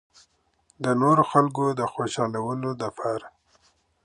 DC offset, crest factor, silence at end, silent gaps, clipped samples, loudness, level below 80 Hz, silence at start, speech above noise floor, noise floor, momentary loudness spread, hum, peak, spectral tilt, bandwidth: under 0.1%; 22 dB; 0.75 s; none; under 0.1%; -24 LUFS; -66 dBFS; 0.8 s; 42 dB; -66 dBFS; 11 LU; none; -4 dBFS; -6.5 dB/octave; 11 kHz